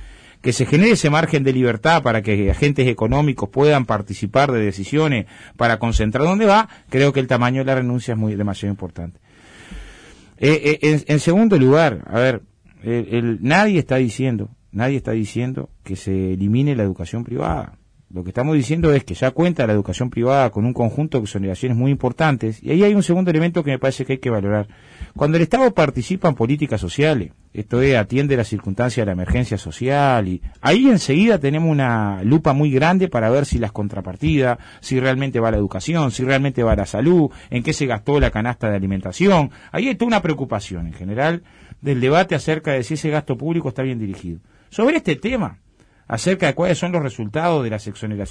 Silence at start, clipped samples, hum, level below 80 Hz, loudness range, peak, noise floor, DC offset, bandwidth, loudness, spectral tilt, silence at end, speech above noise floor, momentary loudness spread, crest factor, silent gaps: 0 s; under 0.1%; none; -36 dBFS; 5 LU; -4 dBFS; -44 dBFS; under 0.1%; 10.5 kHz; -18 LUFS; -6.5 dB/octave; 0 s; 27 dB; 11 LU; 14 dB; none